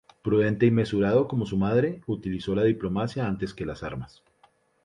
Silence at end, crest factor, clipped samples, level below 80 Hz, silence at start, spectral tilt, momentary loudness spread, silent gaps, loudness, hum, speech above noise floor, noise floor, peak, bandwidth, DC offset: 0.8 s; 16 dB; under 0.1%; -50 dBFS; 0.25 s; -8.5 dB/octave; 12 LU; none; -26 LUFS; none; 38 dB; -63 dBFS; -8 dBFS; 10.5 kHz; under 0.1%